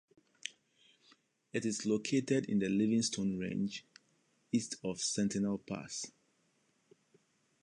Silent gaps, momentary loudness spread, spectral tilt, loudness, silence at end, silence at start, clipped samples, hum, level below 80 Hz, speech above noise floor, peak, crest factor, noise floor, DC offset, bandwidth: none; 15 LU; -4.5 dB/octave; -35 LUFS; 1.5 s; 0.45 s; under 0.1%; none; -72 dBFS; 41 dB; -18 dBFS; 18 dB; -75 dBFS; under 0.1%; 11.5 kHz